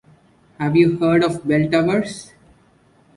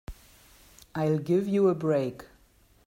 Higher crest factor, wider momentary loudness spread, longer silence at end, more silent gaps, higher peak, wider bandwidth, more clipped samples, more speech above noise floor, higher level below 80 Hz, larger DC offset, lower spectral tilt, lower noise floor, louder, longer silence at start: about the same, 18 dB vs 16 dB; second, 11 LU vs 19 LU; first, 0.9 s vs 0.65 s; neither; first, -2 dBFS vs -14 dBFS; second, 11.5 kHz vs 16 kHz; neither; about the same, 38 dB vs 36 dB; about the same, -52 dBFS vs -54 dBFS; neither; about the same, -7 dB/octave vs -8 dB/octave; second, -55 dBFS vs -61 dBFS; first, -18 LUFS vs -27 LUFS; first, 0.6 s vs 0.1 s